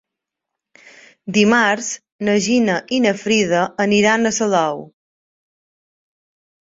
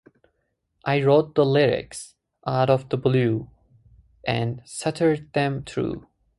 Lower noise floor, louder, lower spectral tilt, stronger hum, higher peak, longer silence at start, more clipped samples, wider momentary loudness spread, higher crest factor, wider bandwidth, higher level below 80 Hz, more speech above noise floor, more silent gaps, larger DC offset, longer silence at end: first, -82 dBFS vs -74 dBFS; first, -17 LUFS vs -23 LUFS; second, -4 dB/octave vs -6.5 dB/octave; neither; first, -2 dBFS vs -6 dBFS; first, 1.25 s vs 0.85 s; neither; second, 9 LU vs 14 LU; about the same, 18 dB vs 18 dB; second, 7.8 kHz vs 11.5 kHz; about the same, -60 dBFS vs -56 dBFS; first, 66 dB vs 52 dB; first, 2.12-2.19 s vs none; neither; first, 1.8 s vs 0.4 s